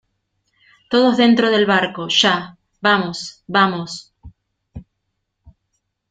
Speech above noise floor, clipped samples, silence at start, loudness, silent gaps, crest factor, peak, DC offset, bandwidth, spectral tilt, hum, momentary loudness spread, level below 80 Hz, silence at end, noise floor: 58 dB; under 0.1%; 0.9 s; -16 LUFS; none; 18 dB; -2 dBFS; under 0.1%; 9.2 kHz; -4 dB/octave; none; 15 LU; -54 dBFS; 0.6 s; -74 dBFS